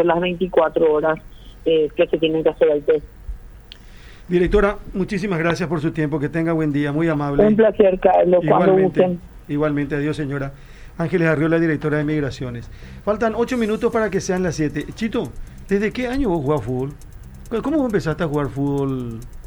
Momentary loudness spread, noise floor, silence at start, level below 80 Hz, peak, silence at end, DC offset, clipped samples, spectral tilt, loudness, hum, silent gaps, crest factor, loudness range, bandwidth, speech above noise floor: 12 LU; -41 dBFS; 0 s; -38 dBFS; 0 dBFS; 0 s; under 0.1%; under 0.1%; -7 dB/octave; -19 LUFS; none; none; 18 dB; 6 LU; over 20 kHz; 22 dB